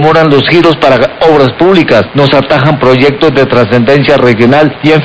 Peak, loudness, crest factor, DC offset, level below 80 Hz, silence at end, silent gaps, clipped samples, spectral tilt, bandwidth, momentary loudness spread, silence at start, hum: 0 dBFS; -6 LUFS; 6 dB; 1%; -36 dBFS; 0 s; none; 8%; -7 dB/octave; 8 kHz; 2 LU; 0 s; none